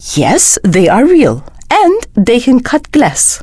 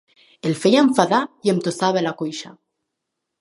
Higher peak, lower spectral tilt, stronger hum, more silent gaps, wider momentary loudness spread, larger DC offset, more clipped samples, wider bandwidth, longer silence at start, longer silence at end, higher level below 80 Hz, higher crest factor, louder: about the same, 0 dBFS vs 0 dBFS; about the same, -4 dB/octave vs -5 dB/octave; neither; neither; second, 5 LU vs 13 LU; neither; neither; about the same, 11 kHz vs 11.5 kHz; second, 0 s vs 0.45 s; second, 0 s vs 0.9 s; first, -34 dBFS vs -68 dBFS; second, 8 dB vs 20 dB; first, -9 LUFS vs -19 LUFS